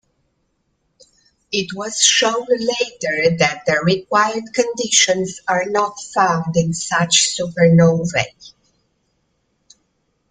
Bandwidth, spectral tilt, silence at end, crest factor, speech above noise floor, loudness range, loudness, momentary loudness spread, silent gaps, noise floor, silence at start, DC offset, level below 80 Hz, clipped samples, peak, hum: 9.6 kHz; -3.5 dB/octave; 1.85 s; 18 dB; 51 dB; 2 LU; -16 LUFS; 8 LU; none; -68 dBFS; 1.5 s; under 0.1%; -56 dBFS; under 0.1%; 0 dBFS; none